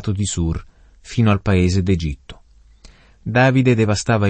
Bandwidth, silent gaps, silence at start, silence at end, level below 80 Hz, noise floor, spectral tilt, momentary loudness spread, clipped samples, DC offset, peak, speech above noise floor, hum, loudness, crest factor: 8.8 kHz; none; 0 s; 0 s; -36 dBFS; -47 dBFS; -6 dB/octave; 13 LU; under 0.1%; under 0.1%; -2 dBFS; 30 dB; none; -18 LUFS; 16 dB